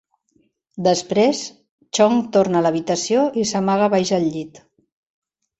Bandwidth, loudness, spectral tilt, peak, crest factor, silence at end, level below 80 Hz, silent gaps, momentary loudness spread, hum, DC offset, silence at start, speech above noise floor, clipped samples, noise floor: 8.2 kHz; -19 LUFS; -5 dB/octave; -4 dBFS; 16 dB; 1 s; -60 dBFS; 1.69-1.78 s; 11 LU; none; under 0.1%; 0.75 s; 46 dB; under 0.1%; -64 dBFS